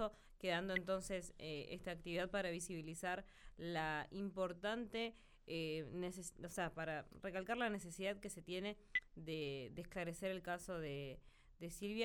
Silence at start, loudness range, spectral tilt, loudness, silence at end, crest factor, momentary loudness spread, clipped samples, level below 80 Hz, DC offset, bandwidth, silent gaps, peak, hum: 0 s; 2 LU; -4.5 dB/octave; -45 LUFS; 0 s; 20 dB; 8 LU; under 0.1%; -64 dBFS; under 0.1%; 18 kHz; none; -26 dBFS; none